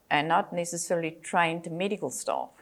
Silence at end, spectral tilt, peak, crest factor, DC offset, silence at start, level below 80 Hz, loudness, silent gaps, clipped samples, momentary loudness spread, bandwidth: 0.15 s; -3.5 dB/octave; -10 dBFS; 20 dB; under 0.1%; 0.1 s; -76 dBFS; -29 LUFS; none; under 0.1%; 7 LU; 16.5 kHz